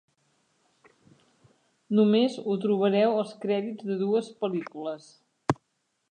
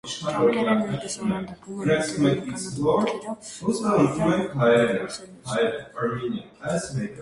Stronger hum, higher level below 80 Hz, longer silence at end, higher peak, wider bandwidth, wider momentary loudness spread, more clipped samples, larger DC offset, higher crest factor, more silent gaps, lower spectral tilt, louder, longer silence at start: neither; second, -68 dBFS vs -56 dBFS; first, 0.55 s vs 0 s; about the same, -8 dBFS vs -8 dBFS; second, 9.4 kHz vs 11.5 kHz; about the same, 12 LU vs 11 LU; neither; neither; about the same, 20 dB vs 18 dB; neither; first, -7 dB/octave vs -5.5 dB/octave; second, -27 LUFS vs -24 LUFS; first, 1.9 s vs 0.05 s